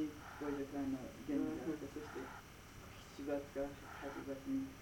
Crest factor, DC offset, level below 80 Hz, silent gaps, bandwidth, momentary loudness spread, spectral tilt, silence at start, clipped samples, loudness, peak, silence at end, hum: 18 dB; under 0.1%; -64 dBFS; none; 19 kHz; 13 LU; -6 dB/octave; 0 s; under 0.1%; -45 LUFS; -28 dBFS; 0 s; none